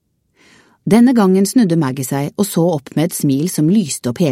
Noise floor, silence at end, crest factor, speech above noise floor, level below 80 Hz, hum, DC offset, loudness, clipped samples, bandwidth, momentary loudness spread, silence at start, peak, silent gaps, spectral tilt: -54 dBFS; 0 s; 14 dB; 40 dB; -58 dBFS; none; under 0.1%; -15 LUFS; under 0.1%; 16.5 kHz; 9 LU; 0.85 s; 0 dBFS; none; -6 dB/octave